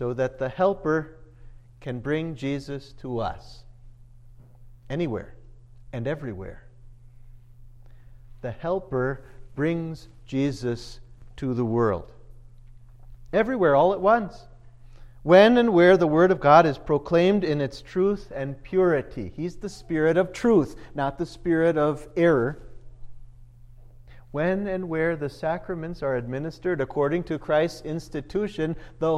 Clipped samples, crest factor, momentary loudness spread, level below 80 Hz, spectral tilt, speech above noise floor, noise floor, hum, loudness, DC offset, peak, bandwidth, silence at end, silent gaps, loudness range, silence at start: under 0.1%; 22 dB; 18 LU; -48 dBFS; -7.5 dB/octave; 25 dB; -48 dBFS; none; -24 LUFS; under 0.1%; -2 dBFS; 11.5 kHz; 0 s; none; 16 LU; 0 s